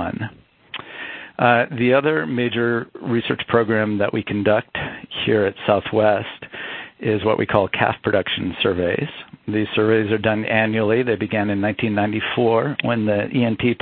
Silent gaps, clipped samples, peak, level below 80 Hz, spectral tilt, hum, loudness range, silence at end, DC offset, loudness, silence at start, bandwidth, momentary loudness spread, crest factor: none; under 0.1%; 0 dBFS; -50 dBFS; -10.5 dB/octave; none; 2 LU; 0.05 s; under 0.1%; -20 LUFS; 0 s; 4.5 kHz; 13 LU; 20 dB